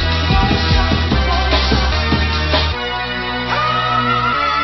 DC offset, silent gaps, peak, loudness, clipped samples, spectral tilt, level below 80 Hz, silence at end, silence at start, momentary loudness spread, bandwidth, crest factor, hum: under 0.1%; none; 0 dBFS; -15 LUFS; under 0.1%; -5.5 dB/octave; -20 dBFS; 0 s; 0 s; 5 LU; 6 kHz; 14 dB; none